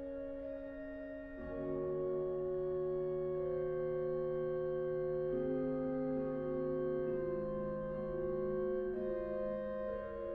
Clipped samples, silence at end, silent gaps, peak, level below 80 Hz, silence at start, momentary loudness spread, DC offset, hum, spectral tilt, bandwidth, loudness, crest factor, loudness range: under 0.1%; 0 s; none; -28 dBFS; -58 dBFS; 0 s; 7 LU; under 0.1%; none; -8.5 dB/octave; 4.4 kHz; -39 LUFS; 12 dB; 2 LU